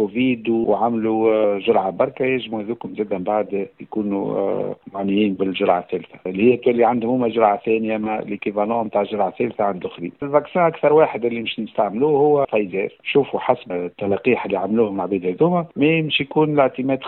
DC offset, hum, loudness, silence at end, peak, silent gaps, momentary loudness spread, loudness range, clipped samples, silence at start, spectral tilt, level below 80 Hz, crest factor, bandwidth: under 0.1%; none; -20 LUFS; 0 s; -2 dBFS; none; 9 LU; 3 LU; under 0.1%; 0 s; -10.5 dB/octave; -60 dBFS; 18 dB; 4.2 kHz